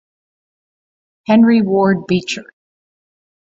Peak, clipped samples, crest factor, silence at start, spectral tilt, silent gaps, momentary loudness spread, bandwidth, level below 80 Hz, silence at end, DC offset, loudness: -2 dBFS; under 0.1%; 16 dB; 1.3 s; -6.5 dB/octave; none; 14 LU; 7.8 kHz; -60 dBFS; 1 s; under 0.1%; -14 LUFS